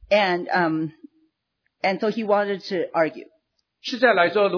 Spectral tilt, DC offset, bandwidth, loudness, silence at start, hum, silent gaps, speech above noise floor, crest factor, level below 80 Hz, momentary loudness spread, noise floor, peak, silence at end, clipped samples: -5.5 dB/octave; under 0.1%; 5.4 kHz; -22 LUFS; 0.1 s; none; none; 54 dB; 18 dB; -64 dBFS; 12 LU; -76 dBFS; -4 dBFS; 0 s; under 0.1%